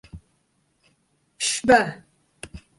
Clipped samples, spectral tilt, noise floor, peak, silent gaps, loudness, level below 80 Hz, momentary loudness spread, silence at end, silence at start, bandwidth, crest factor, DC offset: under 0.1%; -2.5 dB/octave; -68 dBFS; -4 dBFS; none; -20 LUFS; -52 dBFS; 25 LU; 0.2 s; 0.15 s; 11.5 kHz; 22 dB; under 0.1%